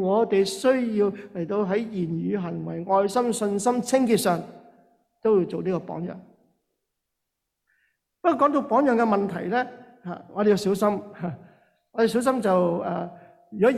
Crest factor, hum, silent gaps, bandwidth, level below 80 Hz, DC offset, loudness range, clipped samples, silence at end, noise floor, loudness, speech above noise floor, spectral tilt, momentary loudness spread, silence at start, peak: 16 dB; none; none; 15 kHz; -66 dBFS; under 0.1%; 6 LU; under 0.1%; 0 s; -82 dBFS; -24 LUFS; 58 dB; -6 dB/octave; 13 LU; 0 s; -8 dBFS